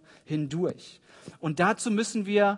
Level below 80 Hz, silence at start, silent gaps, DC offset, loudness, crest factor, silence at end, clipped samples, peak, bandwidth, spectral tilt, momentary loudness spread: -72 dBFS; 0.3 s; none; under 0.1%; -28 LUFS; 18 dB; 0 s; under 0.1%; -8 dBFS; 11 kHz; -5 dB/octave; 20 LU